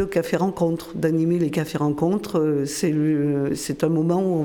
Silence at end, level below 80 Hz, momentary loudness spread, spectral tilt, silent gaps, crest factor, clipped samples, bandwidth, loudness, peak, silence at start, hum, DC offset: 0 s; -54 dBFS; 3 LU; -6.5 dB/octave; none; 14 dB; under 0.1%; 18.5 kHz; -22 LUFS; -8 dBFS; 0 s; none; under 0.1%